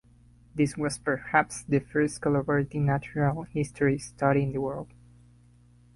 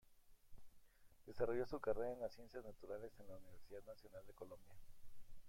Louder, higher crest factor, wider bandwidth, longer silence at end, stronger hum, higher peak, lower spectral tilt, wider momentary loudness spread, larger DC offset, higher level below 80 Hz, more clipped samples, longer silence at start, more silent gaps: first, -27 LUFS vs -49 LUFS; about the same, 22 dB vs 22 dB; second, 11.5 kHz vs 16.5 kHz; first, 1.1 s vs 0 s; first, 60 Hz at -45 dBFS vs none; first, -6 dBFS vs -26 dBFS; about the same, -6.5 dB/octave vs -6.5 dB/octave; second, 7 LU vs 17 LU; neither; first, -54 dBFS vs -66 dBFS; neither; first, 0.55 s vs 0.05 s; neither